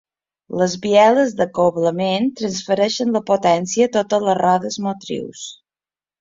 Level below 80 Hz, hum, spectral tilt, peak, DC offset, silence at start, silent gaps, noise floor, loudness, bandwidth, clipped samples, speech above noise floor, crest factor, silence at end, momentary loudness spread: -60 dBFS; none; -4.5 dB/octave; -2 dBFS; under 0.1%; 0.5 s; none; under -90 dBFS; -18 LUFS; 7.8 kHz; under 0.1%; over 73 dB; 16 dB; 0.65 s; 13 LU